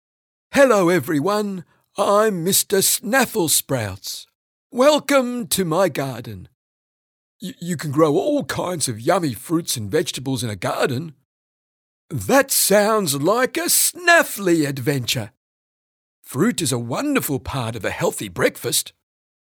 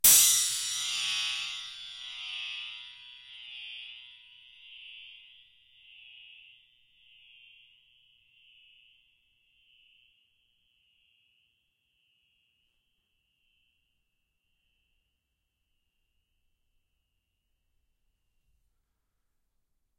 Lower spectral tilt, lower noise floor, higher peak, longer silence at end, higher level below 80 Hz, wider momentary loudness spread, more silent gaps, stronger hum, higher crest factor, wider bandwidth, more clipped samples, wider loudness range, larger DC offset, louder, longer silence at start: first, -3.5 dB/octave vs 3 dB/octave; first, under -90 dBFS vs -81 dBFS; first, -2 dBFS vs -8 dBFS; second, 0.65 s vs 14.8 s; first, -56 dBFS vs -70 dBFS; second, 15 LU vs 27 LU; first, 4.35-4.70 s, 6.54-7.39 s, 11.25-12.09 s, 15.37-16.23 s vs none; neither; second, 18 dB vs 28 dB; first, over 20 kHz vs 16 kHz; neither; second, 6 LU vs 26 LU; neither; first, -19 LUFS vs -27 LUFS; first, 0.5 s vs 0.05 s